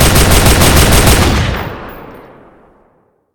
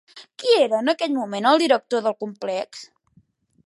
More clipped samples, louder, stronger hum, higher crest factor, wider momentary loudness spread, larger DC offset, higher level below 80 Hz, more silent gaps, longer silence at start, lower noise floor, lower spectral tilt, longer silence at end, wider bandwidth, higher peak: first, 0.8% vs under 0.1%; first, -8 LUFS vs -21 LUFS; neither; second, 10 dB vs 20 dB; first, 18 LU vs 14 LU; neither; first, -16 dBFS vs -78 dBFS; neither; second, 0 s vs 0.15 s; second, -54 dBFS vs -60 dBFS; about the same, -4 dB/octave vs -4 dB/octave; first, 1.15 s vs 0.8 s; first, over 20 kHz vs 11.5 kHz; about the same, 0 dBFS vs -2 dBFS